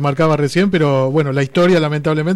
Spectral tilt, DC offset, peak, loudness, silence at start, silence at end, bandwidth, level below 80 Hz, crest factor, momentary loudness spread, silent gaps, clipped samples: -7 dB/octave; under 0.1%; -6 dBFS; -15 LUFS; 0 s; 0 s; 12.5 kHz; -48 dBFS; 8 dB; 4 LU; none; under 0.1%